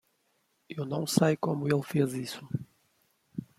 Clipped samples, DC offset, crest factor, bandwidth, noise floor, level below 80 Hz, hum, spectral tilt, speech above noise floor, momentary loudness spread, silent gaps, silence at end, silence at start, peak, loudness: under 0.1%; under 0.1%; 24 dB; 16 kHz; -74 dBFS; -70 dBFS; none; -6 dB/octave; 45 dB; 16 LU; none; 0.15 s; 0.7 s; -8 dBFS; -30 LUFS